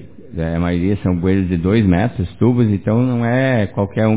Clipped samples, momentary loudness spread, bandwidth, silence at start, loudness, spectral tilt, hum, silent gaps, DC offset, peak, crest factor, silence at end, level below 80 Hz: under 0.1%; 6 LU; 4 kHz; 0 s; -17 LUFS; -12.5 dB/octave; none; none; 1%; -2 dBFS; 14 dB; 0 s; -32 dBFS